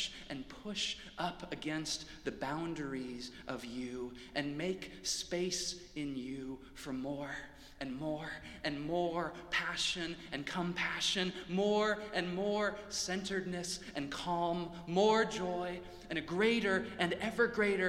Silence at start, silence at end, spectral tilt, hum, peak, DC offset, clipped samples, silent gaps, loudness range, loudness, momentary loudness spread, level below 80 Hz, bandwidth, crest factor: 0 s; 0 s; -3.5 dB/octave; none; -16 dBFS; under 0.1%; under 0.1%; none; 7 LU; -37 LUFS; 12 LU; -60 dBFS; 16 kHz; 22 dB